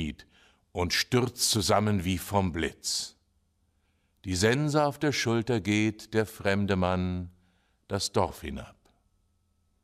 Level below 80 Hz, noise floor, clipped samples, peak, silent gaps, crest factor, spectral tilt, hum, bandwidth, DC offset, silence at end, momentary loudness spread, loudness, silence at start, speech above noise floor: -54 dBFS; -71 dBFS; under 0.1%; -10 dBFS; none; 20 dB; -4.5 dB/octave; none; 15.5 kHz; under 0.1%; 1.15 s; 14 LU; -28 LUFS; 0 s; 44 dB